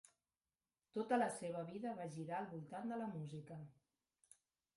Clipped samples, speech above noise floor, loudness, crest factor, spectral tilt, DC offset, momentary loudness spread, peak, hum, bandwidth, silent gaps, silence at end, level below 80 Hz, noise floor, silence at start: under 0.1%; over 46 dB; -45 LUFS; 22 dB; -6 dB/octave; under 0.1%; 14 LU; -24 dBFS; none; 11.5 kHz; none; 1.05 s; -84 dBFS; under -90 dBFS; 0.95 s